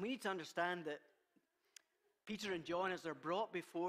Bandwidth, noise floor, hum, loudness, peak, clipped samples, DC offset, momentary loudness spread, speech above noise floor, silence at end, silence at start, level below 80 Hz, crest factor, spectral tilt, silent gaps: 15.5 kHz; -80 dBFS; none; -43 LUFS; -26 dBFS; under 0.1%; under 0.1%; 9 LU; 37 dB; 0 s; 0 s; -84 dBFS; 18 dB; -4.5 dB/octave; none